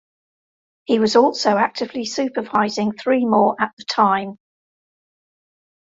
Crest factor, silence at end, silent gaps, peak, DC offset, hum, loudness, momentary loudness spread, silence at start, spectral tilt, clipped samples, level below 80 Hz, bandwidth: 18 dB; 1.5 s; 3.73-3.77 s; -2 dBFS; under 0.1%; none; -19 LUFS; 9 LU; 0.9 s; -4.5 dB/octave; under 0.1%; -64 dBFS; 7.8 kHz